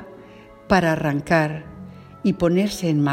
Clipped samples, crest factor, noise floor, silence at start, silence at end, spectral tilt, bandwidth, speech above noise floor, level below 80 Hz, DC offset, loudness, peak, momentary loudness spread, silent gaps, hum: under 0.1%; 18 dB; -44 dBFS; 0 s; 0 s; -6.5 dB/octave; 16 kHz; 25 dB; -46 dBFS; under 0.1%; -21 LUFS; -2 dBFS; 21 LU; none; none